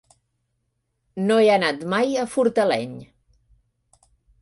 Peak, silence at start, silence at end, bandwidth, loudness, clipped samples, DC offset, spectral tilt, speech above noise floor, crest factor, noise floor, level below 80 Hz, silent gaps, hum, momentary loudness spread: -6 dBFS; 1.15 s; 1.35 s; 11.5 kHz; -20 LUFS; under 0.1%; under 0.1%; -5 dB/octave; 54 dB; 16 dB; -74 dBFS; -64 dBFS; none; none; 17 LU